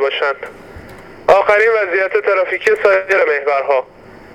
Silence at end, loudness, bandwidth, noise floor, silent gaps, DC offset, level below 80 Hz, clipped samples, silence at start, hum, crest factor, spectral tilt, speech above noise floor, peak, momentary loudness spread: 0.2 s; -14 LUFS; 12 kHz; -35 dBFS; none; under 0.1%; -50 dBFS; under 0.1%; 0 s; none; 14 dB; -3.5 dB/octave; 21 dB; 0 dBFS; 9 LU